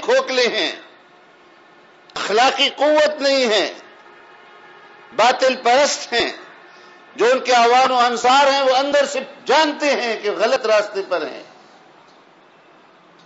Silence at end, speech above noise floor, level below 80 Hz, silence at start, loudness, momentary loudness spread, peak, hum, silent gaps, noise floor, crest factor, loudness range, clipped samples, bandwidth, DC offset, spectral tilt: 1.8 s; 33 dB; -66 dBFS; 0 s; -17 LUFS; 11 LU; -4 dBFS; none; none; -49 dBFS; 14 dB; 4 LU; under 0.1%; 8 kHz; under 0.1%; -1.5 dB/octave